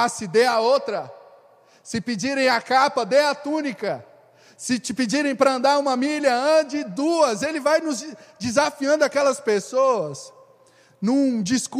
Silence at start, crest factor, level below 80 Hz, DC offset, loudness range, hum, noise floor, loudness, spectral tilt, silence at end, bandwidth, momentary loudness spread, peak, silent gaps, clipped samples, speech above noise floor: 0 s; 18 dB; -68 dBFS; under 0.1%; 2 LU; none; -55 dBFS; -21 LUFS; -3.5 dB/octave; 0 s; 15 kHz; 11 LU; -4 dBFS; none; under 0.1%; 34 dB